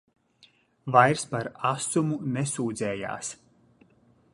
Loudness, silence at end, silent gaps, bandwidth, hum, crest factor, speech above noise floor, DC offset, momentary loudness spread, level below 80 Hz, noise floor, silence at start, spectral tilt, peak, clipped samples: -26 LUFS; 1 s; none; 11.5 kHz; none; 24 dB; 36 dB; under 0.1%; 15 LU; -66 dBFS; -62 dBFS; 0.85 s; -5 dB/octave; -4 dBFS; under 0.1%